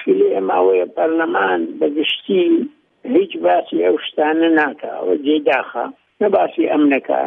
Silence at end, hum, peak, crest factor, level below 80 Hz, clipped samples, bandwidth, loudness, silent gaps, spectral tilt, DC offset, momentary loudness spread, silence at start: 0 s; none; -2 dBFS; 14 dB; -72 dBFS; under 0.1%; 3.8 kHz; -17 LUFS; none; -7.5 dB/octave; under 0.1%; 6 LU; 0 s